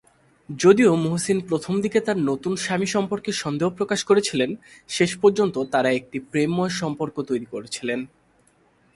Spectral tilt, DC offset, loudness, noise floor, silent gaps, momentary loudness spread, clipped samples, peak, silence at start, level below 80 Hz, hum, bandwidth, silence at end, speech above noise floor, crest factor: -5 dB/octave; under 0.1%; -22 LUFS; -60 dBFS; none; 10 LU; under 0.1%; -2 dBFS; 0.5 s; -62 dBFS; none; 11.5 kHz; 0.9 s; 38 dB; 20 dB